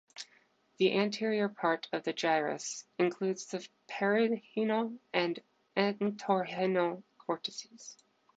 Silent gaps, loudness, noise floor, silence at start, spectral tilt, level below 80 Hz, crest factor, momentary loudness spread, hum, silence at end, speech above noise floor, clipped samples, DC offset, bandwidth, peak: none; -33 LUFS; -68 dBFS; 0.15 s; -4.5 dB/octave; -84 dBFS; 20 dB; 14 LU; none; 0.45 s; 36 dB; under 0.1%; under 0.1%; 9 kHz; -12 dBFS